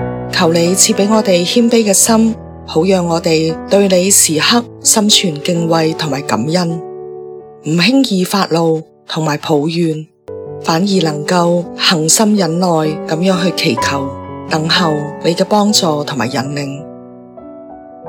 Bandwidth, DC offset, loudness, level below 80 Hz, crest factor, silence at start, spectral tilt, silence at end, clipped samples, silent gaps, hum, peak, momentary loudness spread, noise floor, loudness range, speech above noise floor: over 20 kHz; under 0.1%; -12 LUFS; -48 dBFS; 14 dB; 0 s; -3.5 dB/octave; 0 s; 0.1%; none; none; 0 dBFS; 15 LU; -33 dBFS; 4 LU; 21 dB